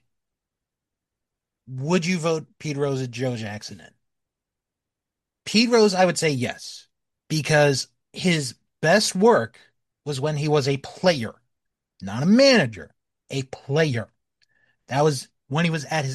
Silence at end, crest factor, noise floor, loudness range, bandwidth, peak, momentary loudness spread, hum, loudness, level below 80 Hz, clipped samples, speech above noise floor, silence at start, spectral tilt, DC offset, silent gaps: 0 s; 20 dB; -86 dBFS; 6 LU; 12.5 kHz; -4 dBFS; 18 LU; none; -22 LUFS; -64 dBFS; under 0.1%; 64 dB; 1.7 s; -5 dB/octave; under 0.1%; none